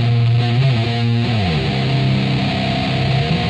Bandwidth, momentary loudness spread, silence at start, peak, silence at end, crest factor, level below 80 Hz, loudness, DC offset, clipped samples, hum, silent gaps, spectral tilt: 8.6 kHz; 3 LU; 0 s; -4 dBFS; 0 s; 12 dB; -36 dBFS; -17 LUFS; under 0.1%; under 0.1%; none; none; -7 dB/octave